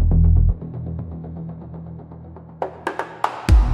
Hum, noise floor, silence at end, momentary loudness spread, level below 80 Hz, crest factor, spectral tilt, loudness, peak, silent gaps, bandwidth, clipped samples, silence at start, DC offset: none; -38 dBFS; 0 s; 20 LU; -22 dBFS; 18 dB; -7.5 dB/octave; -23 LUFS; -2 dBFS; none; 10.5 kHz; under 0.1%; 0 s; under 0.1%